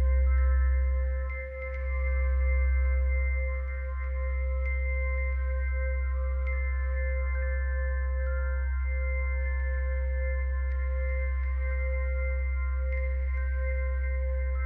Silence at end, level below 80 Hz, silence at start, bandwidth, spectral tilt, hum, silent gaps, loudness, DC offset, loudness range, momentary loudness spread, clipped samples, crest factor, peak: 0 s; -28 dBFS; 0 s; 2.4 kHz; -10 dB/octave; none; none; -30 LUFS; under 0.1%; 2 LU; 4 LU; under 0.1%; 10 dB; -18 dBFS